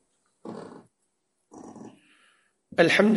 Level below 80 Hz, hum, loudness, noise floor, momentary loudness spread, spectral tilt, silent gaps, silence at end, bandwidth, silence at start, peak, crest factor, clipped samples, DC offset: -72 dBFS; none; -22 LUFS; -76 dBFS; 27 LU; -5.5 dB/octave; none; 0 s; 11.5 kHz; 0.45 s; -4 dBFS; 24 dB; under 0.1%; under 0.1%